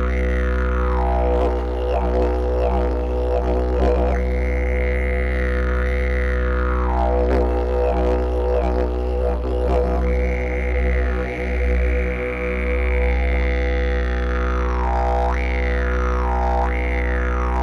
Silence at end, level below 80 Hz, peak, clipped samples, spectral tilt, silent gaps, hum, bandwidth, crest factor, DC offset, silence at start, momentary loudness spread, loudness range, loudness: 0 s; -20 dBFS; -6 dBFS; under 0.1%; -8 dB/octave; none; none; 6.2 kHz; 12 dB; under 0.1%; 0 s; 3 LU; 1 LU; -21 LUFS